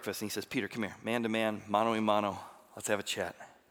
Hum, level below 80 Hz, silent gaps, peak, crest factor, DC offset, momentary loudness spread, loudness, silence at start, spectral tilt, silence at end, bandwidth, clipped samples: none; -78 dBFS; none; -12 dBFS; 22 dB; under 0.1%; 11 LU; -33 LUFS; 0 s; -4 dB/octave; 0.2 s; 19.5 kHz; under 0.1%